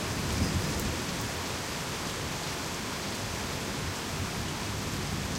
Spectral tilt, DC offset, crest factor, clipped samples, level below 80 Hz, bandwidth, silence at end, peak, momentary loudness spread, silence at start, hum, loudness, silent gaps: -3.5 dB/octave; under 0.1%; 16 dB; under 0.1%; -44 dBFS; 16 kHz; 0 s; -16 dBFS; 4 LU; 0 s; none; -33 LUFS; none